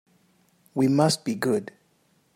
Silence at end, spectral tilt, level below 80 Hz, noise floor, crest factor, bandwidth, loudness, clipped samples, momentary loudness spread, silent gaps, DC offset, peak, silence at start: 0.7 s; -5.5 dB/octave; -70 dBFS; -65 dBFS; 18 dB; 16 kHz; -24 LUFS; under 0.1%; 13 LU; none; under 0.1%; -8 dBFS; 0.75 s